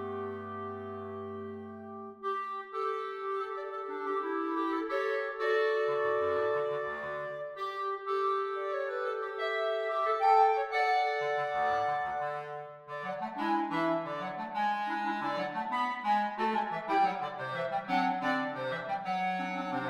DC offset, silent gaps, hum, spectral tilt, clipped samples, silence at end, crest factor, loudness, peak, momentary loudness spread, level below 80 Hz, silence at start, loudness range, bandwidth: under 0.1%; none; none; -5.5 dB/octave; under 0.1%; 0 s; 18 dB; -32 LUFS; -14 dBFS; 11 LU; -76 dBFS; 0 s; 6 LU; 12 kHz